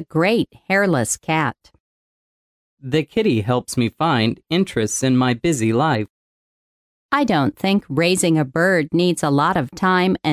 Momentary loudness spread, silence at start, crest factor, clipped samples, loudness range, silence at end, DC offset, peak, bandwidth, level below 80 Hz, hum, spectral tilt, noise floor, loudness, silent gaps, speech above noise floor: 5 LU; 0 s; 14 dB; under 0.1%; 4 LU; 0 s; under 0.1%; -4 dBFS; 16 kHz; -52 dBFS; none; -5 dB/octave; under -90 dBFS; -19 LUFS; 1.80-2.77 s, 6.10-7.09 s; over 72 dB